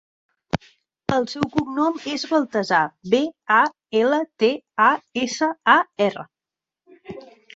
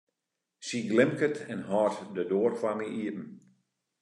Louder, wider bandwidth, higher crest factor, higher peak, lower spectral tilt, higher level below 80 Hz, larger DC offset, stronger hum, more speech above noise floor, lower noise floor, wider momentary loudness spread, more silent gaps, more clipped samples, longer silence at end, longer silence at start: first, -21 LUFS vs -30 LUFS; second, 8 kHz vs 11 kHz; about the same, 20 dB vs 22 dB; first, -2 dBFS vs -10 dBFS; about the same, -4.5 dB/octave vs -5.5 dB/octave; first, -56 dBFS vs -82 dBFS; neither; neither; first, 68 dB vs 57 dB; about the same, -89 dBFS vs -86 dBFS; about the same, 13 LU vs 12 LU; neither; neither; second, 0.3 s vs 0.65 s; about the same, 0.55 s vs 0.6 s